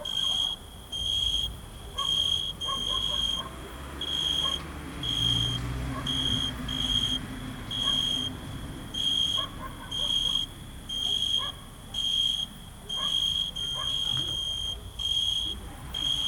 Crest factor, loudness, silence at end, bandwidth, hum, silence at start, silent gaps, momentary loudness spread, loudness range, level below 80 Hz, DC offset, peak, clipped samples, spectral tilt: 16 dB; -27 LUFS; 0 s; 19 kHz; none; 0 s; none; 13 LU; 1 LU; -44 dBFS; under 0.1%; -14 dBFS; under 0.1%; -2.5 dB/octave